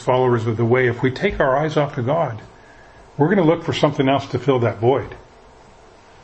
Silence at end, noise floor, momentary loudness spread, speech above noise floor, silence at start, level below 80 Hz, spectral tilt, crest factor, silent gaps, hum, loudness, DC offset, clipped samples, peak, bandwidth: 1 s; -46 dBFS; 5 LU; 28 dB; 0 s; -46 dBFS; -7.5 dB/octave; 18 dB; none; none; -19 LUFS; under 0.1%; under 0.1%; -2 dBFS; 8.4 kHz